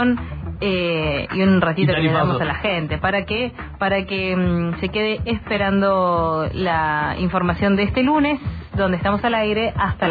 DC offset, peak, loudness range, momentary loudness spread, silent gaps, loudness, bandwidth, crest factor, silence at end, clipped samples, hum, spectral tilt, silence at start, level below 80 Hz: under 0.1%; -6 dBFS; 2 LU; 6 LU; none; -20 LUFS; 5 kHz; 14 dB; 0 s; under 0.1%; none; -9.5 dB/octave; 0 s; -36 dBFS